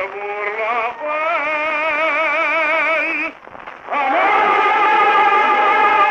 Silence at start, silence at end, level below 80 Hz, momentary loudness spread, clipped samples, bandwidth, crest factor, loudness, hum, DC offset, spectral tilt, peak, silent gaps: 0 s; 0 s; -64 dBFS; 11 LU; under 0.1%; 8.4 kHz; 14 dB; -15 LUFS; none; under 0.1%; -3 dB/octave; -2 dBFS; none